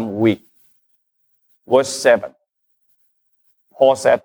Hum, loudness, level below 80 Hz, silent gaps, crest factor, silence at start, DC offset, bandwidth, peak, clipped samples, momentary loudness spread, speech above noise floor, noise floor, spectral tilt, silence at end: none; -17 LUFS; -64 dBFS; none; 18 dB; 0 s; under 0.1%; over 20 kHz; -2 dBFS; under 0.1%; 8 LU; 53 dB; -68 dBFS; -4.5 dB/octave; 0.05 s